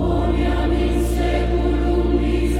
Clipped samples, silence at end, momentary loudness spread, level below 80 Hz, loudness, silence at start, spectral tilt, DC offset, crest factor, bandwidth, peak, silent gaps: under 0.1%; 0 s; 1 LU; -22 dBFS; -20 LUFS; 0 s; -7.5 dB/octave; under 0.1%; 12 dB; 13.5 kHz; -6 dBFS; none